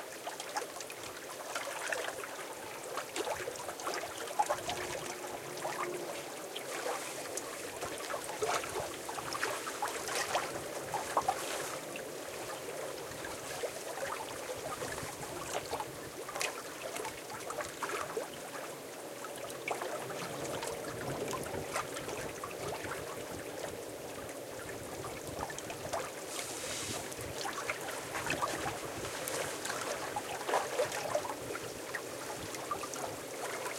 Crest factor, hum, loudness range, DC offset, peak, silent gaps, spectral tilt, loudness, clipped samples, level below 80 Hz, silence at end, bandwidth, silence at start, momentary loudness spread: 26 dB; none; 4 LU; under 0.1%; -14 dBFS; none; -2.5 dB/octave; -39 LUFS; under 0.1%; -66 dBFS; 0 s; 16.5 kHz; 0 s; 7 LU